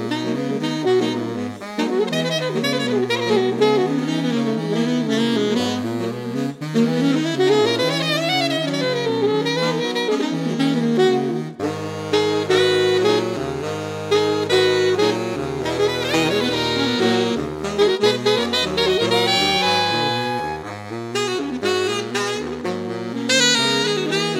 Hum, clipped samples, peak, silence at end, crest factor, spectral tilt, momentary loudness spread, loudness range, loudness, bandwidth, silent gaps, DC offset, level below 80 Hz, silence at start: none; under 0.1%; -4 dBFS; 0 s; 16 dB; -4 dB/octave; 9 LU; 3 LU; -19 LUFS; 16.5 kHz; none; under 0.1%; -54 dBFS; 0 s